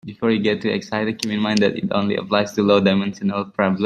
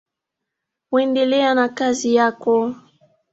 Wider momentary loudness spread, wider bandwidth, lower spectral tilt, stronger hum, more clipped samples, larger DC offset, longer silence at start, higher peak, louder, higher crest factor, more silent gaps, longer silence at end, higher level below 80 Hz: about the same, 7 LU vs 6 LU; first, 11.5 kHz vs 8 kHz; first, -6 dB/octave vs -3.5 dB/octave; neither; neither; neither; second, 0.05 s vs 0.9 s; about the same, -2 dBFS vs -4 dBFS; about the same, -20 LUFS vs -18 LUFS; about the same, 18 dB vs 16 dB; neither; second, 0 s vs 0.6 s; first, -60 dBFS vs -66 dBFS